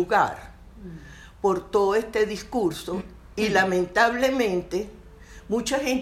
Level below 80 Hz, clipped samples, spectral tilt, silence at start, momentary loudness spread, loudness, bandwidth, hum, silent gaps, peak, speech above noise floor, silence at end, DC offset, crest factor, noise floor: -48 dBFS; under 0.1%; -4.5 dB/octave; 0 s; 19 LU; -24 LUFS; 16 kHz; none; none; -6 dBFS; 22 dB; 0 s; under 0.1%; 18 dB; -45 dBFS